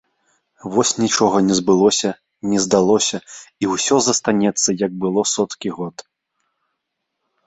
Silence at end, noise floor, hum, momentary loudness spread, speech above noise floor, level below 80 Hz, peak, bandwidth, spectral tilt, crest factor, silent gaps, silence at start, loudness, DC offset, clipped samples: 1.45 s; -77 dBFS; none; 13 LU; 59 dB; -58 dBFS; -2 dBFS; 8.4 kHz; -3.5 dB/octave; 18 dB; none; 0.65 s; -17 LUFS; under 0.1%; under 0.1%